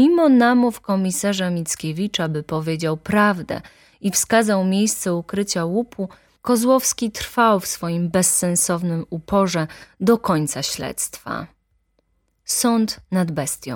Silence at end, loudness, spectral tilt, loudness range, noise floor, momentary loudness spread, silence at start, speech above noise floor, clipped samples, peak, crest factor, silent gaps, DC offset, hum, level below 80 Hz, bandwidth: 0 s; -20 LUFS; -4.5 dB/octave; 4 LU; -66 dBFS; 11 LU; 0 s; 47 dB; under 0.1%; -2 dBFS; 18 dB; none; under 0.1%; none; -52 dBFS; 17.5 kHz